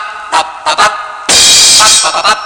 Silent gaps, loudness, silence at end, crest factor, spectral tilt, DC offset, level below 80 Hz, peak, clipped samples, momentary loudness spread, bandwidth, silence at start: none; -5 LUFS; 0 s; 8 dB; 1.5 dB/octave; under 0.1%; -42 dBFS; 0 dBFS; 2%; 12 LU; over 20 kHz; 0 s